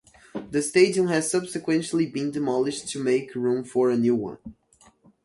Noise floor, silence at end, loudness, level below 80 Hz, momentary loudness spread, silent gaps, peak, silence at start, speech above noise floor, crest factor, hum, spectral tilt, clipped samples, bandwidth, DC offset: -57 dBFS; 0.7 s; -24 LUFS; -62 dBFS; 9 LU; none; -6 dBFS; 0.35 s; 34 dB; 18 dB; none; -5 dB/octave; under 0.1%; 11.5 kHz; under 0.1%